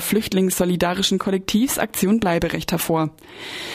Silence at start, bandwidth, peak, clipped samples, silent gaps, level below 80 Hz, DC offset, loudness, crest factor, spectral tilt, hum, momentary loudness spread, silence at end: 0 s; 15.5 kHz; -4 dBFS; under 0.1%; none; -44 dBFS; under 0.1%; -20 LUFS; 16 dB; -4.5 dB/octave; none; 7 LU; 0 s